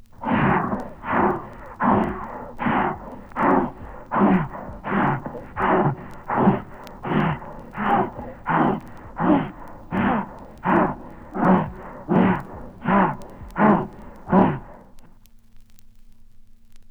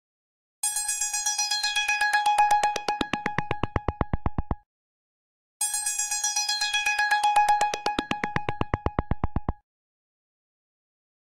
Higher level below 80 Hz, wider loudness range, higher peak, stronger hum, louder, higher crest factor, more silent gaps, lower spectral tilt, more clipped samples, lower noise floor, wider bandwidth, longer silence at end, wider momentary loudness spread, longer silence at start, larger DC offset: about the same, -44 dBFS vs -40 dBFS; second, 2 LU vs 7 LU; first, -4 dBFS vs -10 dBFS; neither; first, -22 LUFS vs -25 LUFS; about the same, 20 dB vs 18 dB; second, none vs 4.66-5.60 s; first, -9 dB/octave vs -2 dB/octave; neither; second, -47 dBFS vs under -90 dBFS; second, 5 kHz vs 16 kHz; second, 0.1 s vs 1.8 s; first, 16 LU vs 10 LU; second, 0.2 s vs 0.65 s; neither